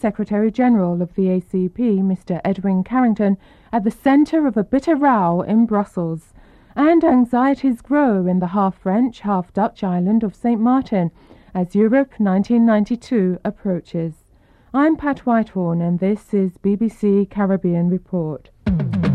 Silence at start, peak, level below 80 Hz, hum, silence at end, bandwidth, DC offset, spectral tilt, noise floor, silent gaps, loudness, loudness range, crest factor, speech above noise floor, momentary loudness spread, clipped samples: 0.05 s; -6 dBFS; -46 dBFS; none; 0 s; 9.4 kHz; under 0.1%; -9.5 dB/octave; -52 dBFS; none; -18 LUFS; 3 LU; 12 dB; 35 dB; 9 LU; under 0.1%